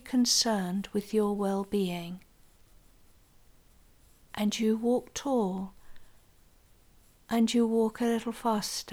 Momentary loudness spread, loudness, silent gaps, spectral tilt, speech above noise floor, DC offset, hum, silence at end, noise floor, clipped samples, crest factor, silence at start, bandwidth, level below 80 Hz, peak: 12 LU; -29 LUFS; none; -4 dB/octave; 31 dB; under 0.1%; none; 0 s; -60 dBFS; under 0.1%; 16 dB; 0.05 s; 17 kHz; -60 dBFS; -14 dBFS